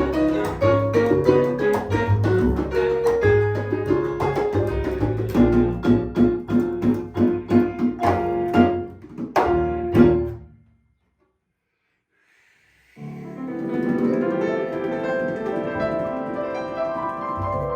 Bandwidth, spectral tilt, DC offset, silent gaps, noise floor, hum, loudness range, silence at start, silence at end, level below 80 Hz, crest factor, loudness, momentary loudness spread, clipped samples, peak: 15.5 kHz; -8.5 dB/octave; under 0.1%; none; -74 dBFS; none; 7 LU; 0 s; 0 s; -38 dBFS; 20 dB; -21 LUFS; 9 LU; under 0.1%; -2 dBFS